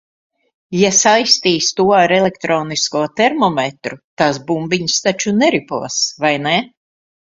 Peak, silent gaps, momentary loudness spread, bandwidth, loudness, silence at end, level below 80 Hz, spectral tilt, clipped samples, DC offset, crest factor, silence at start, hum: 0 dBFS; 4.04-4.17 s; 9 LU; 7.8 kHz; -15 LUFS; 0.7 s; -56 dBFS; -3 dB/octave; under 0.1%; under 0.1%; 16 dB; 0.7 s; none